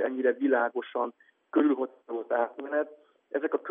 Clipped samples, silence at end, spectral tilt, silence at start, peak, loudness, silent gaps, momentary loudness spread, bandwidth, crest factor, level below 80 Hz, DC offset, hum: under 0.1%; 0 s; -2.5 dB/octave; 0 s; -10 dBFS; -30 LUFS; none; 10 LU; 3.7 kHz; 20 dB; under -90 dBFS; under 0.1%; none